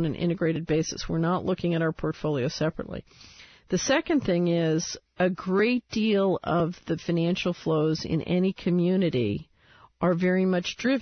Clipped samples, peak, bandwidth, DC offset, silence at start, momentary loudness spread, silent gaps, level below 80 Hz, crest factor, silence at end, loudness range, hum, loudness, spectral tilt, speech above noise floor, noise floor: under 0.1%; -12 dBFS; 6.6 kHz; under 0.1%; 0 s; 6 LU; none; -52 dBFS; 14 dB; 0 s; 3 LU; none; -26 LUFS; -6 dB/octave; 31 dB; -57 dBFS